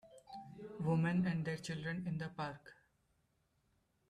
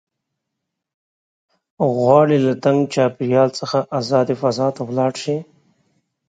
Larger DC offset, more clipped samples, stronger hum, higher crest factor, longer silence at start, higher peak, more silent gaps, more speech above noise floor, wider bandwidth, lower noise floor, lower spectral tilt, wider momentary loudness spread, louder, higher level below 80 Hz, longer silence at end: neither; neither; neither; about the same, 16 dB vs 20 dB; second, 0.05 s vs 1.8 s; second, -26 dBFS vs 0 dBFS; neither; second, 41 dB vs 62 dB; first, 11 kHz vs 9.2 kHz; about the same, -79 dBFS vs -79 dBFS; about the same, -7 dB/octave vs -6.5 dB/octave; first, 19 LU vs 8 LU; second, -39 LUFS vs -18 LUFS; second, -72 dBFS vs -66 dBFS; first, 1.35 s vs 0.85 s